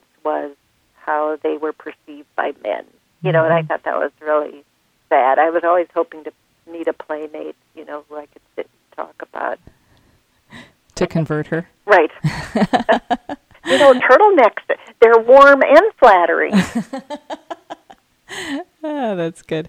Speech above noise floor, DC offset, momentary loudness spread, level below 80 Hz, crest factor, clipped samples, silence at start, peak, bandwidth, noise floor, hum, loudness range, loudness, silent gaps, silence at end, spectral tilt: 42 dB; under 0.1%; 23 LU; -52 dBFS; 16 dB; under 0.1%; 0.25 s; 0 dBFS; 11 kHz; -57 dBFS; none; 18 LU; -15 LUFS; none; 0 s; -6 dB/octave